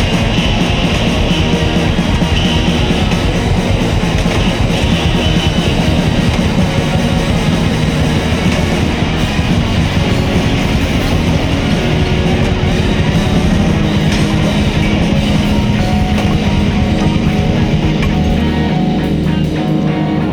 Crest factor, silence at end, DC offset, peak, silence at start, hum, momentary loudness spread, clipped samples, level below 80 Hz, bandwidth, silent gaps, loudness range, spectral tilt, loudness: 10 dB; 0 s; under 0.1%; -2 dBFS; 0 s; none; 1 LU; under 0.1%; -20 dBFS; 17.5 kHz; none; 1 LU; -6 dB/octave; -13 LUFS